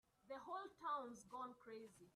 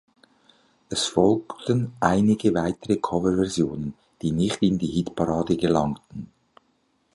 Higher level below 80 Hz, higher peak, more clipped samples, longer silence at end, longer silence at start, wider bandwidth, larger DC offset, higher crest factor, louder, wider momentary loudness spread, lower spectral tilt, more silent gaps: second, -88 dBFS vs -50 dBFS; second, -36 dBFS vs -4 dBFS; neither; second, 0.05 s vs 0.9 s; second, 0.25 s vs 0.9 s; first, 13 kHz vs 11.5 kHz; neither; about the same, 16 dB vs 20 dB; second, -52 LUFS vs -24 LUFS; about the same, 11 LU vs 10 LU; second, -4 dB/octave vs -6 dB/octave; neither